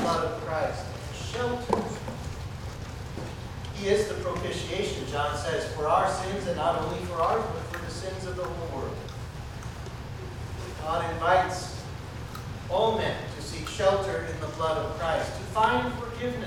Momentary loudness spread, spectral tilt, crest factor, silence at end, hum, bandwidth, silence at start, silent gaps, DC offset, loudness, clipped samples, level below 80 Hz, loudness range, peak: 13 LU; -5 dB/octave; 22 dB; 0 s; none; 17 kHz; 0 s; none; under 0.1%; -30 LUFS; under 0.1%; -44 dBFS; 5 LU; -8 dBFS